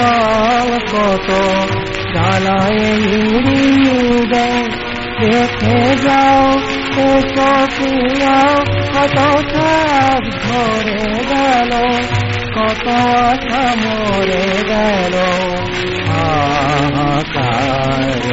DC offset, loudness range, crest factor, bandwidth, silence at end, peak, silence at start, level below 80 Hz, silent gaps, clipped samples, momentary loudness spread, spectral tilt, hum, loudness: under 0.1%; 2 LU; 12 dB; 8 kHz; 0 s; 0 dBFS; 0 s; -32 dBFS; none; under 0.1%; 5 LU; -4 dB/octave; none; -13 LUFS